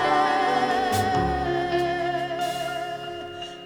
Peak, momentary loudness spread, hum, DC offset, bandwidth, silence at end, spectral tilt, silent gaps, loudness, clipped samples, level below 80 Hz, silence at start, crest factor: -8 dBFS; 12 LU; none; under 0.1%; 19 kHz; 0 s; -4.5 dB/octave; none; -25 LUFS; under 0.1%; -44 dBFS; 0 s; 16 dB